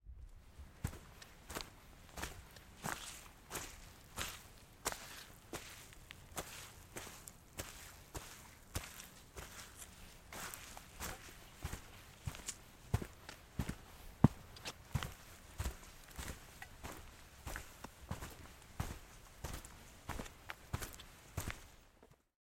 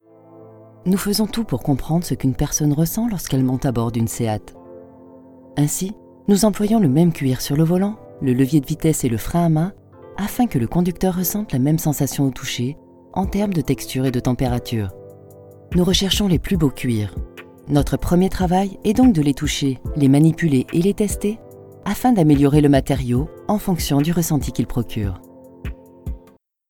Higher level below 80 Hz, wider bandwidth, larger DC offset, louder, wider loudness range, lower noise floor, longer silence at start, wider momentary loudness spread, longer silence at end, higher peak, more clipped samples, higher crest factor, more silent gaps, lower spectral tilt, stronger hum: second, -56 dBFS vs -34 dBFS; about the same, 16.5 kHz vs 18 kHz; neither; second, -47 LUFS vs -19 LUFS; first, 9 LU vs 5 LU; first, -67 dBFS vs -52 dBFS; second, 0.05 s vs 0.35 s; about the same, 12 LU vs 13 LU; second, 0.25 s vs 0.5 s; second, -10 dBFS vs 0 dBFS; neither; first, 36 dB vs 18 dB; neither; second, -4.5 dB/octave vs -6 dB/octave; neither